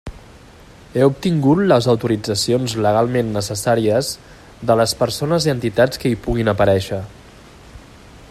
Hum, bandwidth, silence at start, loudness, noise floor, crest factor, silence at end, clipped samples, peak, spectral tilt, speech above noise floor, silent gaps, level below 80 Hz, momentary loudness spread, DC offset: none; 15 kHz; 0.05 s; -18 LUFS; -43 dBFS; 18 dB; 0.05 s; under 0.1%; 0 dBFS; -5.5 dB/octave; 26 dB; none; -40 dBFS; 11 LU; under 0.1%